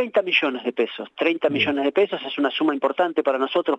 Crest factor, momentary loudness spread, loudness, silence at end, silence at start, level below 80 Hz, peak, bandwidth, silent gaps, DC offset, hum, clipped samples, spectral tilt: 14 dB; 5 LU; -22 LUFS; 0 s; 0 s; -76 dBFS; -6 dBFS; 8.2 kHz; none; under 0.1%; none; under 0.1%; -6 dB/octave